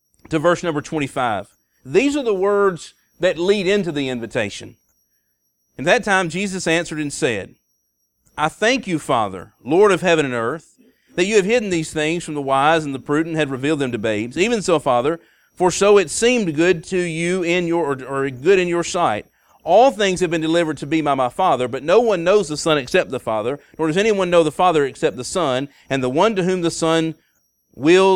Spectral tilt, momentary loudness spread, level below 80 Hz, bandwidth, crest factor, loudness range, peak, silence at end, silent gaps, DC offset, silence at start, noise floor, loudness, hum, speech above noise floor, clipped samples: -4.5 dB/octave; 9 LU; -52 dBFS; 14 kHz; 18 dB; 4 LU; -2 dBFS; 0 s; none; under 0.1%; 0.3 s; -69 dBFS; -18 LUFS; none; 51 dB; under 0.1%